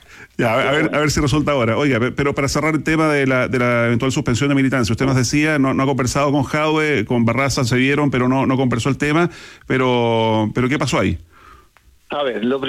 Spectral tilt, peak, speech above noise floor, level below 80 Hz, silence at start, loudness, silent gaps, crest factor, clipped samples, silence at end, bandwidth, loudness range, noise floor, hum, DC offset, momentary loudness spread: -5.5 dB/octave; -6 dBFS; 35 dB; -40 dBFS; 0.15 s; -17 LUFS; none; 10 dB; under 0.1%; 0 s; 15 kHz; 2 LU; -52 dBFS; none; under 0.1%; 4 LU